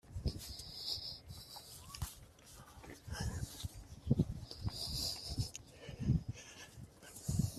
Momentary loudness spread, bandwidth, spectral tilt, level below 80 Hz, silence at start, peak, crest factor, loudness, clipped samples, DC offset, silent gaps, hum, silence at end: 17 LU; 15.5 kHz; -5 dB/octave; -52 dBFS; 0.05 s; -18 dBFS; 24 dB; -42 LUFS; under 0.1%; under 0.1%; none; none; 0 s